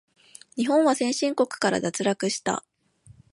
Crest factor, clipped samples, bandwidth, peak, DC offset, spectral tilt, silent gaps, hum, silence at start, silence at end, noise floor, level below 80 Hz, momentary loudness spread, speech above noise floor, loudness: 18 dB; under 0.1%; 11.5 kHz; -8 dBFS; under 0.1%; -4 dB/octave; none; none; 0.55 s; 0.2 s; -55 dBFS; -68 dBFS; 9 LU; 31 dB; -24 LUFS